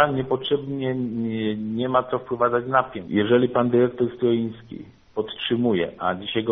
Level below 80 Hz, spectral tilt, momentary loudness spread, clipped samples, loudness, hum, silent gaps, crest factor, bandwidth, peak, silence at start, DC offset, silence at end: -58 dBFS; -4.5 dB/octave; 10 LU; under 0.1%; -23 LUFS; none; none; 18 dB; 4 kHz; -4 dBFS; 0 s; under 0.1%; 0 s